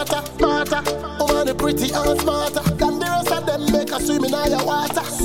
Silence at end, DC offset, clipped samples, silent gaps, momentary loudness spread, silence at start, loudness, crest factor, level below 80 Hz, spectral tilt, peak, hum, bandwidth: 0 s; 0.7%; under 0.1%; none; 3 LU; 0 s; -20 LUFS; 18 dB; -36 dBFS; -4 dB/octave; -2 dBFS; none; 17 kHz